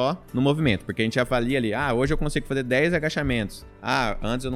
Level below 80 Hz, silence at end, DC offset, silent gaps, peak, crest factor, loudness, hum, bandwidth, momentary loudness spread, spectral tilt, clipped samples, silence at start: -36 dBFS; 0 s; under 0.1%; none; -6 dBFS; 18 dB; -24 LUFS; none; 15 kHz; 5 LU; -6 dB/octave; under 0.1%; 0 s